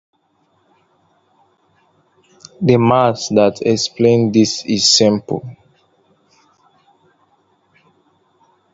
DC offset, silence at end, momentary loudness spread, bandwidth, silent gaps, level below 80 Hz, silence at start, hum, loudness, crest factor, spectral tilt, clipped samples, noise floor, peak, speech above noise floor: under 0.1%; 3.2 s; 10 LU; 8 kHz; none; -56 dBFS; 2.6 s; none; -14 LUFS; 18 dB; -4.5 dB/octave; under 0.1%; -61 dBFS; 0 dBFS; 47 dB